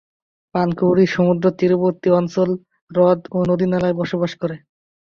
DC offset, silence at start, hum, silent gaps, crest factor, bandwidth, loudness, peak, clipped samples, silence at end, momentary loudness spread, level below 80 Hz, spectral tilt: under 0.1%; 0.55 s; none; 2.82-2.87 s; 14 dB; 7 kHz; -18 LUFS; -4 dBFS; under 0.1%; 0.5 s; 10 LU; -54 dBFS; -8 dB/octave